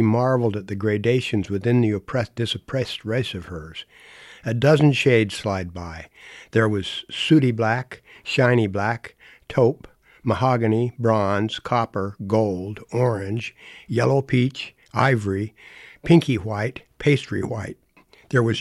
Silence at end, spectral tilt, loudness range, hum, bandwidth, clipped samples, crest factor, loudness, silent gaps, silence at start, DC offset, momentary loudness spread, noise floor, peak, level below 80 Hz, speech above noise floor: 0 s; -7 dB/octave; 2 LU; none; 12 kHz; under 0.1%; 18 dB; -22 LUFS; none; 0 s; under 0.1%; 16 LU; -55 dBFS; -4 dBFS; -52 dBFS; 33 dB